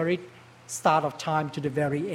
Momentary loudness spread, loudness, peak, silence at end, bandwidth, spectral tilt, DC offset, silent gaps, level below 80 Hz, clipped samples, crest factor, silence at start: 7 LU; -27 LUFS; -8 dBFS; 0 s; 16 kHz; -5.5 dB/octave; under 0.1%; none; -66 dBFS; under 0.1%; 18 dB; 0 s